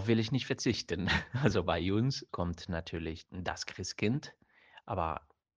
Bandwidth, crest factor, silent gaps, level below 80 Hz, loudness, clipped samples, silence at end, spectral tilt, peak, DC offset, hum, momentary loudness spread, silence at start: 10 kHz; 22 dB; none; -52 dBFS; -34 LUFS; under 0.1%; 0.35 s; -5.5 dB/octave; -12 dBFS; under 0.1%; none; 10 LU; 0 s